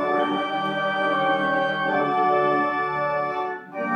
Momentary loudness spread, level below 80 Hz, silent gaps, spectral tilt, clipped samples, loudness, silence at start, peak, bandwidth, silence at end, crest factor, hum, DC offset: 6 LU; -66 dBFS; none; -6 dB/octave; under 0.1%; -23 LUFS; 0 s; -10 dBFS; 9.2 kHz; 0 s; 14 dB; none; under 0.1%